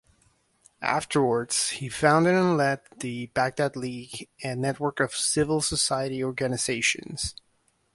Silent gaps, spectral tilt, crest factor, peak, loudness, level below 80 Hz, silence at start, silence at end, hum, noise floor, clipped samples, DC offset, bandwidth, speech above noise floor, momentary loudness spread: none; -3.5 dB/octave; 22 dB; -4 dBFS; -26 LUFS; -54 dBFS; 0.8 s; 0.6 s; none; -69 dBFS; under 0.1%; under 0.1%; 12 kHz; 43 dB; 12 LU